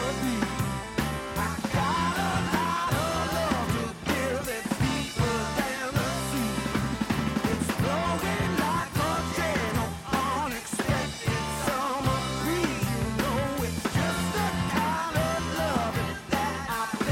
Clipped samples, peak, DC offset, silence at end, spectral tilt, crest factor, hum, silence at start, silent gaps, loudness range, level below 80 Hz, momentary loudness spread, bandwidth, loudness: under 0.1%; -14 dBFS; under 0.1%; 0 s; -5 dB/octave; 14 dB; none; 0 s; none; 1 LU; -42 dBFS; 3 LU; 16.5 kHz; -28 LUFS